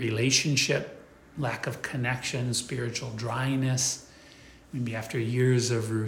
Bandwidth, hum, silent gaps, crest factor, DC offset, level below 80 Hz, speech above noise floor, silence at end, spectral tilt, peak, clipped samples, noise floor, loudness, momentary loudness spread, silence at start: 16.5 kHz; none; none; 18 dB; under 0.1%; -60 dBFS; 24 dB; 0 s; -4 dB/octave; -10 dBFS; under 0.1%; -52 dBFS; -28 LUFS; 11 LU; 0 s